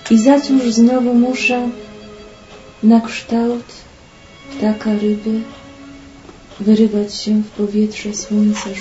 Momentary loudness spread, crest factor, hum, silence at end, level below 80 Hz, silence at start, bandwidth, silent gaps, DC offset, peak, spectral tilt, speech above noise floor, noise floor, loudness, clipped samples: 21 LU; 16 dB; none; 0 s; -48 dBFS; 0 s; 8 kHz; none; under 0.1%; 0 dBFS; -5.5 dB/octave; 27 dB; -42 dBFS; -15 LUFS; under 0.1%